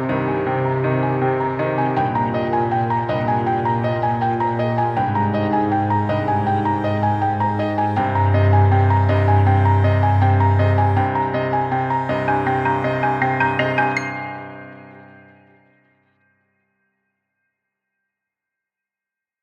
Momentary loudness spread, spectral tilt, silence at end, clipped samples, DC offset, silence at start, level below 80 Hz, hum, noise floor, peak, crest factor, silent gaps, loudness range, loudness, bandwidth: 5 LU; -9 dB/octave; 4.4 s; under 0.1%; under 0.1%; 0 s; -50 dBFS; none; -87 dBFS; -4 dBFS; 14 dB; none; 6 LU; -19 LUFS; 7 kHz